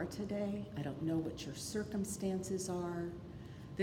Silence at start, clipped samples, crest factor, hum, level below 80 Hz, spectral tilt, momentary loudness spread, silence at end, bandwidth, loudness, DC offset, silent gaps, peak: 0 s; under 0.1%; 18 dB; none; -62 dBFS; -5.5 dB/octave; 9 LU; 0 s; 18 kHz; -40 LUFS; under 0.1%; none; -22 dBFS